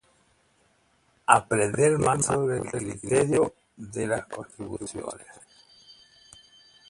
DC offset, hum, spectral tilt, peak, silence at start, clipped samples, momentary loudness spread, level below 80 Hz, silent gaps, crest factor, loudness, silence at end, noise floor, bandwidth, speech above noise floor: under 0.1%; none; -5 dB/octave; 0 dBFS; 1.3 s; under 0.1%; 17 LU; -56 dBFS; none; 28 dB; -25 LUFS; 0.95 s; -66 dBFS; 11.5 kHz; 40 dB